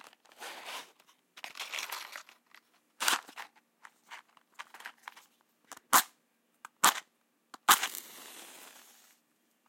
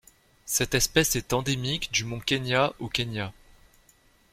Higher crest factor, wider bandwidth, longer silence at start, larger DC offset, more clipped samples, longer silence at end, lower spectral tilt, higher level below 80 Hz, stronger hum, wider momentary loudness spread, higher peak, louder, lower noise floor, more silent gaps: first, 36 dB vs 22 dB; about the same, 16.5 kHz vs 16.5 kHz; about the same, 0.4 s vs 0.45 s; neither; neither; about the same, 1 s vs 1 s; second, 1.5 dB/octave vs -3 dB/octave; second, -88 dBFS vs -48 dBFS; neither; first, 25 LU vs 9 LU; first, 0 dBFS vs -6 dBFS; second, -30 LUFS vs -26 LUFS; first, -74 dBFS vs -61 dBFS; neither